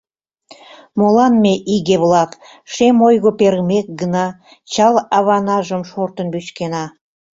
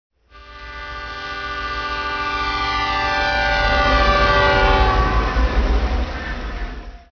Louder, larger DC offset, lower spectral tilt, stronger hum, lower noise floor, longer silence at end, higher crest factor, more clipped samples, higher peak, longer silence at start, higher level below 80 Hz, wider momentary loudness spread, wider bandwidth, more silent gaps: first, -15 LUFS vs -19 LUFS; neither; about the same, -6 dB/octave vs -5 dB/octave; neither; first, -47 dBFS vs -42 dBFS; first, 0.5 s vs 0.15 s; about the same, 14 dB vs 16 dB; neither; about the same, -2 dBFS vs -2 dBFS; first, 0.95 s vs 0.35 s; second, -56 dBFS vs -24 dBFS; second, 12 LU vs 16 LU; first, 7.8 kHz vs 5.4 kHz; neither